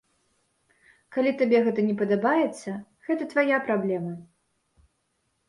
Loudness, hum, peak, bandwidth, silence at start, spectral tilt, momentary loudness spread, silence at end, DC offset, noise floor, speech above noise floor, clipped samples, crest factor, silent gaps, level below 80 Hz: -25 LUFS; none; -10 dBFS; 11.5 kHz; 1.1 s; -7 dB/octave; 14 LU; 1.25 s; under 0.1%; -74 dBFS; 50 dB; under 0.1%; 18 dB; none; -72 dBFS